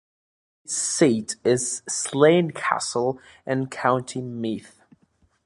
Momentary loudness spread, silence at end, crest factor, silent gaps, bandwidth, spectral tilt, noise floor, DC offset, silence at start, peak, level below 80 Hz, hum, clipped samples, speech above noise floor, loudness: 12 LU; 0.8 s; 22 dB; none; 11.5 kHz; -4 dB/octave; -64 dBFS; under 0.1%; 0.7 s; -2 dBFS; -66 dBFS; none; under 0.1%; 42 dB; -23 LUFS